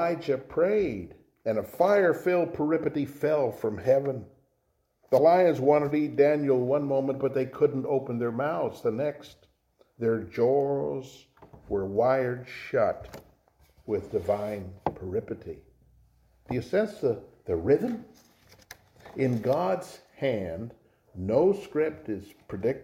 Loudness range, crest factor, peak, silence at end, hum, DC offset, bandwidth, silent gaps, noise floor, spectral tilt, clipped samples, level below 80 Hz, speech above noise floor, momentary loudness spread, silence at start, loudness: 7 LU; 18 dB; -10 dBFS; 0 s; none; under 0.1%; 16.5 kHz; none; -73 dBFS; -8 dB/octave; under 0.1%; -60 dBFS; 47 dB; 15 LU; 0 s; -27 LUFS